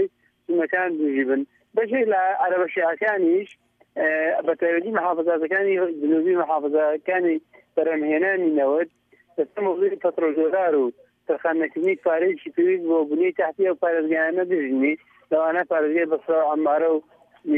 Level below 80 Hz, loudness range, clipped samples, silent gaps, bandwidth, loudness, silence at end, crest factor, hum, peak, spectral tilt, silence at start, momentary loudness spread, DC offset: -80 dBFS; 1 LU; under 0.1%; none; 3.7 kHz; -22 LUFS; 0 s; 14 dB; none; -8 dBFS; -8 dB/octave; 0 s; 6 LU; under 0.1%